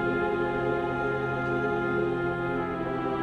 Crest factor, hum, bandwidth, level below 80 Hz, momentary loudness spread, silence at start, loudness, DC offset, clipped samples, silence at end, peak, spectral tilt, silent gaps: 12 dB; none; 8.4 kHz; -50 dBFS; 3 LU; 0 s; -28 LUFS; under 0.1%; under 0.1%; 0 s; -16 dBFS; -8 dB/octave; none